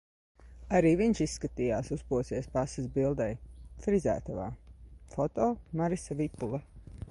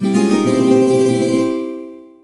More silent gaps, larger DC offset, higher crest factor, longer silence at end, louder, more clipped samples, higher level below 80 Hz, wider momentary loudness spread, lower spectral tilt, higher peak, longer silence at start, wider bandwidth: neither; neither; about the same, 18 dB vs 14 dB; second, 0 s vs 0.25 s; second, -32 LUFS vs -14 LUFS; neither; first, -48 dBFS vs -64 dBFS; about the same, 15 LU vs 15 LU; about the same, -7 dB/octave vs -6.5 dB/octave; second, -14 dBFS vs -2 dBFS; first, 0.4 s vs 0 s; about the same, 11.5 kHz vs 11.5 kHz